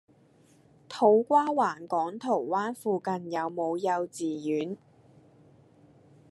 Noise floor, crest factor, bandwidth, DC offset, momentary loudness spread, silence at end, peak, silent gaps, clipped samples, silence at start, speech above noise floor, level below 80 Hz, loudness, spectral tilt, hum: -61 dBFS; 20 dB; 12.5 kHz; under 0.1%; 10 LU; 1.55 s; -10 dBFS; none; under 0.1%; 0.9 s; 33 dB; -82 dBFS; -28 LUFS; -6 dB/octave; none